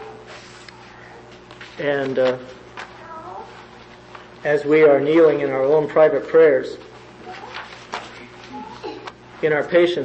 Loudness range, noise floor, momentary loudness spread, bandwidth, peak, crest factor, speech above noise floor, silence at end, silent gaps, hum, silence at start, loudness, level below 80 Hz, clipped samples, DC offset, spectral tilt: 10 LU; -42 dBFS; 25 LU; 8.4 kHz; -2 dBFS; 18 dB; 26 dB; 0 s; none; 60 Hz at -55 dBFS; 0 s; -17 LUFS; -58 dBFS; under 0.1%; under 0.1%; -6.5 dB/octave